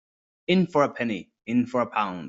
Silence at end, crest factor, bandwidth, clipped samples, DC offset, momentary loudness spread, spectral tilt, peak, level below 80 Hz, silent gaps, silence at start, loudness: 0 s; 20 dB; 7.8 kHz; under 0.1%; under 0.1%; 9 LU; -7 dB/octave; -6 dBFS; -66 dBFS; none; 0.5 s; -25 LUFS